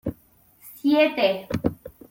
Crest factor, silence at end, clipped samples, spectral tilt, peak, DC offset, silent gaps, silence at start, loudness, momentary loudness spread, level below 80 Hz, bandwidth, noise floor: 20 dB; 0.2 s; under 0.1%; -6.5 dB/octave; -6 dBFS; under 0.1%; none; 0.05 s; -23 LUFS; 14 LU; -50 dBFS; 17 kHz; -57 dBFS